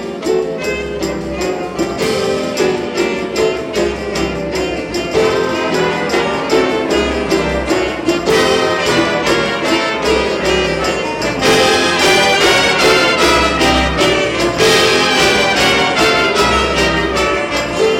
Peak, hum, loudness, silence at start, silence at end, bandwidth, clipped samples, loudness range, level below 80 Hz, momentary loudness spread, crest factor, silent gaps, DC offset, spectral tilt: -4 dBFS; none; -13 LUFS; 0 s; 0 s; 17.5 kHz; under 0.1%; 6 LU; -32 dBFS; 9 LU; 10 dB; none; under 0.1%; -3.5 dB/octave